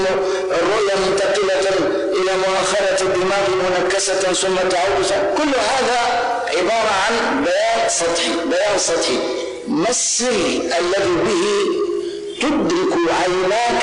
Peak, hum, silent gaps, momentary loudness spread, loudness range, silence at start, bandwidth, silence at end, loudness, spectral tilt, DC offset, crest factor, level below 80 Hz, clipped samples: -10 dBFS; none; none; 3 LU; 1 LU; 0 s; 11 kHz; 0 s; -17 LUFS; -2.5 dB/octave; under 0.1%; 6 dB; -48 dBFS; under 0.1%